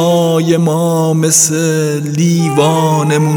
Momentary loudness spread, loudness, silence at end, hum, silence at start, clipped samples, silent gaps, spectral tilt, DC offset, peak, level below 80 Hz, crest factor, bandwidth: 5 LU; -11 LUFS; 0 s; none; 0 s; under 0.1%; none; -5 dB/octave; under 0.1%; 0 dBFS; -58 dBFS; 10 dB; over 20 kHz